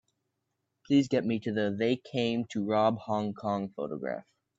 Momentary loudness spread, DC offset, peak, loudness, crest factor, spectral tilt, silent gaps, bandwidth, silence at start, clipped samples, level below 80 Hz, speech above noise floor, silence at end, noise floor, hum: 9 LU; under 0.1%; -12 dBFS; -30 LUFS; 18 dB; -6.5 dB/octave; none; 7.8 kHz; 0.9 s; under 0.1%; -72 dBFS; 53 dB; 0.4 s; -82 dBFS; none